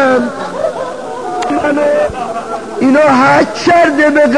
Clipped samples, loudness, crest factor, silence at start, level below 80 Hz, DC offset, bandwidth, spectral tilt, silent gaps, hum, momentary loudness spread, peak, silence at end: under 0.1%; -12 LUFS; 12 dB; 0 s; -44 dBFS; 1%; 10.5 kHz; -5 dB/octave; none; none; 13 LU; 0 dBFS; 0 s